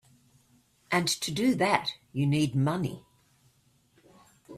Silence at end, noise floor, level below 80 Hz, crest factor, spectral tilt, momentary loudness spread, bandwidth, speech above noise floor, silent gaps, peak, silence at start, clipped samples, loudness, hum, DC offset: 0 s; -66 dBFS; -64 dBFS; 24 dB; -5 dB/octave; 8 LU; 15.5 kHz; 39 dB; none; -8 dBFS; 0.9 s; under 0.1%; -28 LUFS; none; under 0.1%